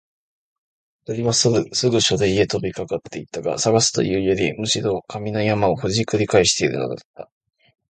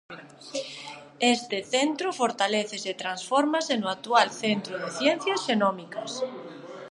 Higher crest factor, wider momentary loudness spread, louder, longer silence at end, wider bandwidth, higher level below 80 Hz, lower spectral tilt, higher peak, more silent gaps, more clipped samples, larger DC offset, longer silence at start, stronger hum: about the same, 20 dB vs 22 dB; second, 11 LU vs 15 LU; first, -20 LUFS vs -26 LUFS; first, 0.7 s vs 0 s; second, 9.4 kHz vs 11.5 kHz; first, -48 dBFS vs -80 dBFS; about the same, -4 dB/octave vs -3 dB/octave; first, 0 dBFS vs -6 dBFS; first, 7.05-7.14 s vs none; neither; neither; first, 1.1 s vs 0.1 s; neither